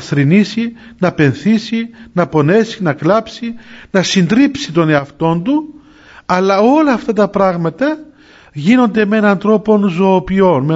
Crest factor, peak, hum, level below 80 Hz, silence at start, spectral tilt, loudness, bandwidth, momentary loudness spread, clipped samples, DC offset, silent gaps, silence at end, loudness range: 12 dB; 0 dBFS; none; -46 dBFS; 0 s; -6.5 dB/octave; -13 LUFS; 7.8 kHz; 10 LU; under 0.1%; under 0.1%; none; 0 s; 2 LU